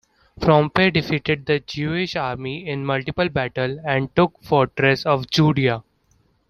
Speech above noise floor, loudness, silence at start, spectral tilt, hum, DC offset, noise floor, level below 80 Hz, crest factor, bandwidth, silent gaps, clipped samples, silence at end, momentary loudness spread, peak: 42 dB; -20 LUFS; 0.4 s; -6.5 dB/octave; none; under 0.1%; -62 dBFS; -48 dBFS; 20 dB; 13 kHz; none; under 0.1%; 0.7 s; 8 LU; -2 dBFS